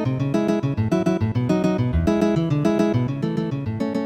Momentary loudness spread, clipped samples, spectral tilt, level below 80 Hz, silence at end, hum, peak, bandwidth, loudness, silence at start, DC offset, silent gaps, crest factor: 5 LU; under 0.1%; -8 dB/octave; -38 dBFS; 0 s; none; -6 dBFS; 12.5 kHz; -21 LUFS; 0 s; under 0.1%; none; 14 dB